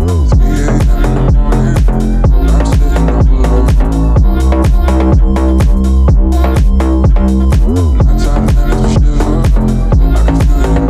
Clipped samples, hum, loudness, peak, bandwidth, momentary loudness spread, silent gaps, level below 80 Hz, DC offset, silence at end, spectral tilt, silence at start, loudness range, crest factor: under 0.1%; none; -11 LUFS; 0 dBFS; 11.5 kHz; 2 LU; none; -8 dBFS; under 0.1%; 0 s; -8 dB/octave; 0 s; 1 LU; 8 dB